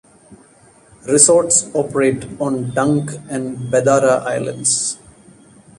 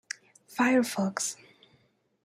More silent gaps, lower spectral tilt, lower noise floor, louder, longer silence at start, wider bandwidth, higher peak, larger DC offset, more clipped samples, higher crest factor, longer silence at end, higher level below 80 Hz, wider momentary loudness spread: neither; about the same, -4 dB/octave vs -4 dB/octave; second, -49 dBFS vs -68 dBFS; first, -16 LUFS vs -28 LUFS; second, 0.3 s vs 0.5 s; second, 12.5 kHz vs 16 kHz; first, 0 dBFS vs -12 dBFS; neither; neither; about the same, 18 dB vs 18 dB; about the same, 0.85 s vs 0.9 s; first, -54 dBFS vs -78 dBFS; second, 14 LU vs 17 LU